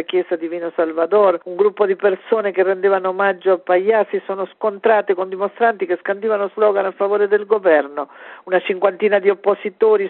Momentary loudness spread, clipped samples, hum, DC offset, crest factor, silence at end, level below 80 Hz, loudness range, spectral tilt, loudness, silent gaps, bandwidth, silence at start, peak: 8 LU; under 0.1%; none; under 0.1%; 16 dB; 0 s; -72 dBFS; 1 LU; -9 dB/octave; -18 LUFS; none; 4.2 kHz; 0 s; -2 dBFS